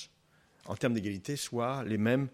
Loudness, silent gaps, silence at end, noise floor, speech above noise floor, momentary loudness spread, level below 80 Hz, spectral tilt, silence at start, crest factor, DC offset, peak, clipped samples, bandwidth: -33 LUFS; none; 0.05 s; -67 dBFS; 35 dB; 10 LU; -70 dBFS; -5.5 dB/octave; 0 s; 18 dB; under 0.1%; -16 dBFS; under 0.1%; 16 kHz